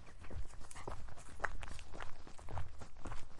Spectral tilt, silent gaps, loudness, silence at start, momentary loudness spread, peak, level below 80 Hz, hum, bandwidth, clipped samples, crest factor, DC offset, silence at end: -4.5 dB/octave; none; -50 LUFS; 0 s; 9 LU; -16 dBFS; -50 dBFS; none; 11.5 kHz; under 0.1%; 22 dB; under 0.1%; 0 s